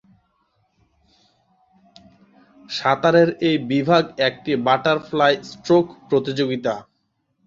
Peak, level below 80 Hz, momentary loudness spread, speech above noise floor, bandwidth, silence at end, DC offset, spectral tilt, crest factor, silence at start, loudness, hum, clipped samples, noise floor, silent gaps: -2 dBFS; -62 dBFS; 8 LU; 51 dB; 7.6 kHz; 0.65 s; under 0.1%; -6 dB/octave; 20 dB; 2.7 s; -19 LUFS; none; under 0.1%; -70 dBFS; none